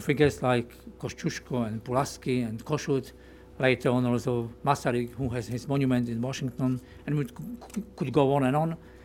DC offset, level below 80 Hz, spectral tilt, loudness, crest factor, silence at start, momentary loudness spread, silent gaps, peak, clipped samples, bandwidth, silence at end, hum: under 0.1%; -54 dBFS; -6.5 dB/octave; -29 LUFS; 20 dB; 0 s; 11 LU; none; -8 dBFS; under 0.1%; 17 kHz; 0 s; none